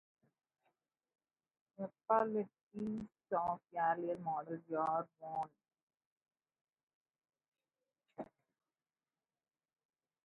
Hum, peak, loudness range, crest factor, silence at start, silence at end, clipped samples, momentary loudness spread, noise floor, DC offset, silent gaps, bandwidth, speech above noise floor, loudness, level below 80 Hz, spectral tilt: none; -20 dBFS; 22 LU; 24 dB; 1.8 s; 2 s; under 0.1%; 16 LU; under -90 dBFS; under 0.1%; 2.63-2.71 s, 5.82-5.87 s, 6.06-6.16 s, 6.61-6.65 s, 6.83-6.87 s, 6.95-7.05 s, 7.48-7.52 s; 4.9 kHz; over 51 dB; -40 LUFS; -82 dBFS; -7 dB/octave